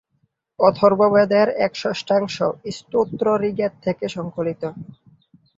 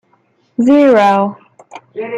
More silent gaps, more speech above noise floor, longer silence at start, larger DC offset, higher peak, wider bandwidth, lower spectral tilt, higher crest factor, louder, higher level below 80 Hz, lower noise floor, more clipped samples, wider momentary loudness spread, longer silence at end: neither; first, 49 dB vs 45 dB; about the same, 0.6 s vs 0.6 s; neither; about the same, -2 dBFS vs -2 dBFS; about the same, 7.8 kHz vs 8 kHz; about the same, -6 dB/octave vs -7 dB/octave; first, 18 dB vs 12 dB; second, -20 LUFS vs -11 LUFS; about the same, -60 dBFS vs -58 dBFS; first, -68 dBFS vs -56 dBFS; neither; second, 11 LU vs 18 LU; first, 0.75 s vs 0 s